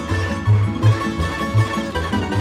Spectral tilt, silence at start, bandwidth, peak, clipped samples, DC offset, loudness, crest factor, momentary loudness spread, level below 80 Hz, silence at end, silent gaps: -6.5 dB/octave; 0 s; 13 kHz; -4 dBFS; under 0.1%; under 0.1%; -19 LUFS; 14 dB; 5 LU; -34 dBFS; 0 s; none